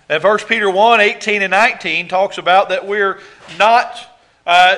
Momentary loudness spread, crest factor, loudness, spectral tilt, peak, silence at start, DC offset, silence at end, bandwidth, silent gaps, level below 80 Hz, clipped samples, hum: 8 LU; 14 dB; -13 LUFS; -3 dB/octave; 0 dBFS; 0.1 s; under 0.1%; 0 s; 12 kHz; none; -60 dBFS; 0.3%; none